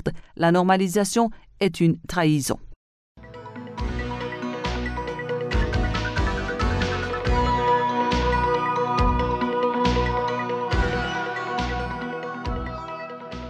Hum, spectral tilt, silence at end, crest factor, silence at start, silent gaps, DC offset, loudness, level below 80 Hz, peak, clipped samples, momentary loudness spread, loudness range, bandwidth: none; -5.5 dB/octave; 0 s; 18 dB; 0 s; 2.76-3.15 s; under 0.1%; -24 LUFS; -32 dBFS; -6 dBFS; under 0.1%; 10 LU; 6 LU; 15 kHz